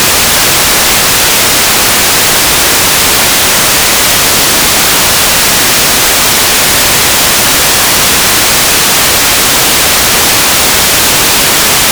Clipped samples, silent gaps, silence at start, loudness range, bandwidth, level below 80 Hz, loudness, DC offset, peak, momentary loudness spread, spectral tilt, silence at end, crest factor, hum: 9%; none; 0 s; 0 LU; over 20 kHz; -28 dBFS; -4 LUFS; under 0.1%; 0 dBFS; 0 LU; -0.5 dB/octave; 0 s; 6 dB; none